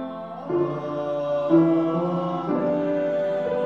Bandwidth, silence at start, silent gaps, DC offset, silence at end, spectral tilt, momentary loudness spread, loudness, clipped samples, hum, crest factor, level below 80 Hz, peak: 6.2 kHz; 0 s; none; 0.1%; 0 s; -9.5 dB/octave; 9 LU; -24 LUFS; under 0.1%; none; 16 dB; -66 dBFS; -6 dBFS